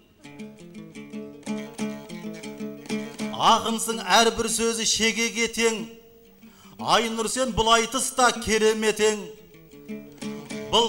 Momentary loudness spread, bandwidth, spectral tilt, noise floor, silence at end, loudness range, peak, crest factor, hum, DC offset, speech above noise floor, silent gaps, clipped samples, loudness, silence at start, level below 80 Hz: 20 LU; 16.5 kHz; -2 dB/octave; -51 dBFS; 0 s; 5 LU; -6 dBFS; 20 dB; none; under 0.1%; 28 dB; none; under 0.1%; -23 LUFS; 0.25 s; -50 dBFS